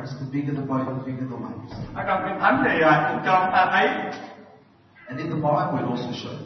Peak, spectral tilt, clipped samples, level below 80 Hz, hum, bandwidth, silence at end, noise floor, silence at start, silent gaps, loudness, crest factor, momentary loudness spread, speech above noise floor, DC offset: -6 dBFS; -7 dB/octave; under 0.1%; -56 dBFS; none; 6.4 kHz; 0 s; -53 dBFS; 0 s; none; -23 LUFS; 18 dB; 16 LU; 29 dB; under 0.1%